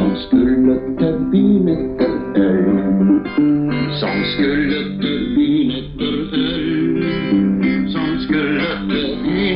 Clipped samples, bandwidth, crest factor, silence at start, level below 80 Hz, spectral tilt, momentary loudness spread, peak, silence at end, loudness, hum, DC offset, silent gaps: under 0.1%; 5.4 kHz; 12 dB; 0 s; -38 dBFS; -10 dB/octave; 5 LU; -4 dBFS; 0 s; -17 LUFS; none; under 0.1%; none